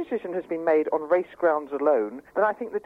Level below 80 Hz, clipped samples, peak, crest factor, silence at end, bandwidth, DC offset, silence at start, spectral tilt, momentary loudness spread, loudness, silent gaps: -70 dBFS; under 0.1%; -10 dBFS; 16 dB; 0.05 s; 5 kHz; under 0.1%; 0 s; -7.5 dB/octave; 7 LU; -25 LUFS; none